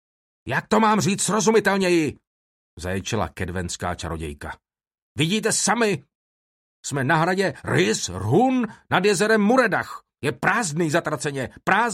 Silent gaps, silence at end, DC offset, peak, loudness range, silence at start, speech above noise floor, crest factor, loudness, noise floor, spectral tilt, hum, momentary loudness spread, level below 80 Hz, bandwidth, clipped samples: 2.27-2.77 s, 5.02-5.15 s, 6.15-6.83 s; 0 s; under 0.1%; -2 dBFS; 6 LU; 0.45 s; over 68 dB; 20 dB; -22 LUFS; under -90 dBFS; -4 dB/octave; none; 12 LU; -50 dBFS; 16 kHz; under 0.1%